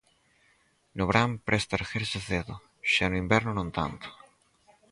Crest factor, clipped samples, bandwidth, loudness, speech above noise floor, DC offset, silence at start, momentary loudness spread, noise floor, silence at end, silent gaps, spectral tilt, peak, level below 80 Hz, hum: 24 dB; under 0.1%; 11.5 kHz; -28 LUFS; 39 dB; under 0.1%; 0.95 s; 14 LU; -67 dBFS; 0.75 s; none; -5 dB/octave; -6 dBFS; -48 dBFS; none